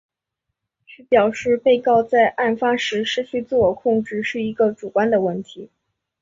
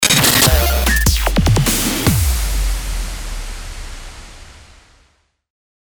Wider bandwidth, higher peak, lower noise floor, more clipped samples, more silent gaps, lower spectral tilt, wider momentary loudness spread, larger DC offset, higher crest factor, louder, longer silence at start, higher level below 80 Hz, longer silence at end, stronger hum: second, 7.6 kHz vs over 20 kHz; about the same, -4 dBFS vs -2 dBFS; first, -80 dBFS vs -58 dBFS; neither; neither; first, -5 dB/octave vs -3 dB/octave; second, 8 LU vs 22 LU; neither; about the same, 16 dB vs 16 dB; second, -19 LUFS vs -15 LUFS; first, 1.1 s vs 0 s; second, -56 dBFS vs -22 dBFS; second, 0.55 s vs 1.25 s; neither